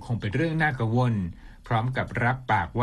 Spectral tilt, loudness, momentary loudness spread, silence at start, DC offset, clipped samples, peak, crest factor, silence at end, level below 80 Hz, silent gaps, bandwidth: -8 dB/octave; -26 LUFS; 5 LU; 0 s; under 0.1%; under 0.1%; -10 dBFS; 16 dB; 0 s; -46 dBFS; none; 10 kHz